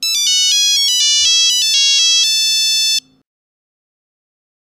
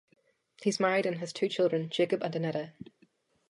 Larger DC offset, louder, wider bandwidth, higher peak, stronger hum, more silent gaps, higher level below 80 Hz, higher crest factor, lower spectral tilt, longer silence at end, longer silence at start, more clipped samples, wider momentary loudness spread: neither; first, -10 LUFS vs -31 LUFS; first, 16 kHz vs 11.5 kHz; first, 0 dBFS vs -14 dBFS; neither; neither; first, -60 dBFS vs -80 dBFS; about the same, 14 dB vs 18 dB; second, 5.5 dB/octave vs -5 dB/octave; first, 1.7 s vs 0.65 s; second, 0 s vs 0.6 s; neither; second, 3 LU vs 14 LU